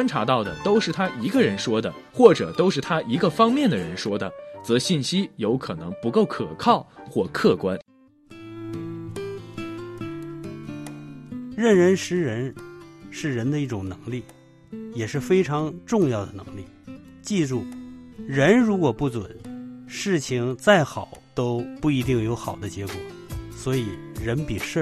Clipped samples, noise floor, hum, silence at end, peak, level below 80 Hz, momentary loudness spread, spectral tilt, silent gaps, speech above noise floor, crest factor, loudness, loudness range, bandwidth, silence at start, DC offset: under 0.1%; -49 dBFS; none; 0 s; 0 dBFS; -52 dBFS; 19 LU; -6 dB/octave; none; 27 dB; 24 dB; -23 LUFS; 7 LU; 13.5 kHz; 0 s; under 0.1%